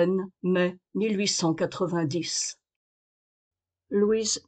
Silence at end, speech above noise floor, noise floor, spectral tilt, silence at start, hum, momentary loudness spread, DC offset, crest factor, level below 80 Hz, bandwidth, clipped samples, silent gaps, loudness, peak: 0.1 s; over 64 dB; under -90 dBFS; -4 dB/octave; 0 s; none; 5 LU; under 0.1%; 16 dB; -68 dBFS; 9.4 kHz; under 0.1%; 2.76-3.51 s; -27 LUFS; -12 dBFS